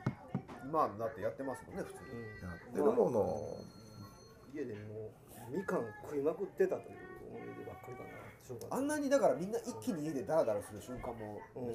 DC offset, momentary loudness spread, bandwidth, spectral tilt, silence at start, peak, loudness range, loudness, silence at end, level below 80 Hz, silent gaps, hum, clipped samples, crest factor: under 0.1%; 18 LU; 15.5 kHz; -6.5 dB/octave; 0 s; -18 dBFS; 4 LU; -38 LUFS; 0 s; -66 dBFS; none; none; under 0.1%; 20 dB